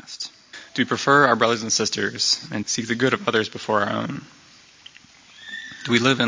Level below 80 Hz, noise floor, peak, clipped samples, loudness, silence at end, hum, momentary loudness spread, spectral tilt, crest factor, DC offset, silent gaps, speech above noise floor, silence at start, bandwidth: -62 dBFS; -50 dBFS; -2 dBFS; under 0.1%; -21 LUFS; 0 s; none; 17 LU; -3 dB/octave; 22 dB; under 0.1%; none; 28 dB; 0.05 s; 7.8 kHz